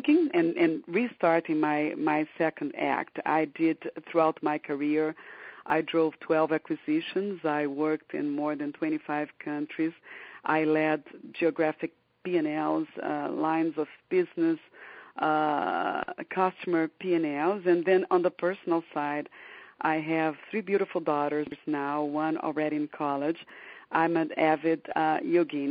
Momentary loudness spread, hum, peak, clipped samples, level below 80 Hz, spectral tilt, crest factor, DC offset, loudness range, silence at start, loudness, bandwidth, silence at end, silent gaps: 9 LU; none; -10 dBFS; under 0.1%; -78 dBFS; -4.5 dB/octave; 18 dB; under 0.1%; 3 LU; 0 s; -29 LUFS; 4.9 kHz; 0 s; none